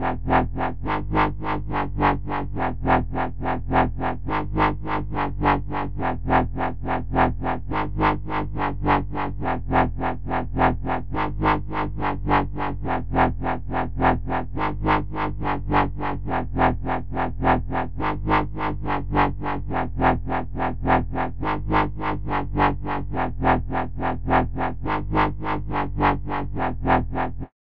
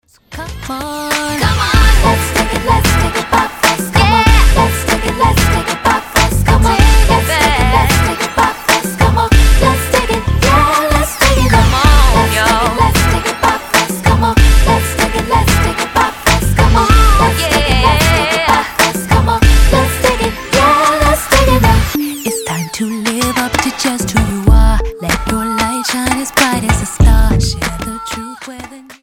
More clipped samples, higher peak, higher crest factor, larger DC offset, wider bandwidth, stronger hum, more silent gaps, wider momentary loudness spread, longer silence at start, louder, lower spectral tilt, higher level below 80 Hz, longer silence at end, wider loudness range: neither; second, -6 dBFS vs 0 dBFS; first, 18 dB vs 10 dB; first, 3% vs under 0.1%; second, 5.4 kHz vs 17.5 kHz; neither; neither; about the same, 6 LU vs 8 LU; second, 0 s vs 0.3 s; second, -24 LUFS vs -12 LUFS; first, -9.5 dB/octave vs -4.5 dB/octave; second, -32 dBFS vs -16 dBFS; about the same, 0.2 s vs 0.1 s; about the same, 1 LU vs 3 LU